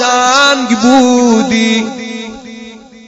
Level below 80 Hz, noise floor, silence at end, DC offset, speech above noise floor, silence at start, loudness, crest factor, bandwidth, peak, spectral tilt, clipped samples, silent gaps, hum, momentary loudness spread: -50 dBFS; -32 dBFS; 0.3 s; under 0.1%; 23 dB; 0 s; -9 LUFS; 10 dB; 8 kHz; 0 dBFS; -3 dB/octave; 0.3%; none; none; 20 LU